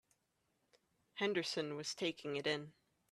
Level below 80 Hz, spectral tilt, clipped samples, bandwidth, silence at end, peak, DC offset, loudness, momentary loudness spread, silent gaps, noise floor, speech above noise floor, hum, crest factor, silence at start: -84 dBFS; -3.5 dB/octave; under 0.1%; 13.5 kHz; 0.4 s; -22 dBFS; under 0.1%; -40 LUFS; 8 LU; none; -83 dBFS; 42 dB; none; 20 dB; 1.15 s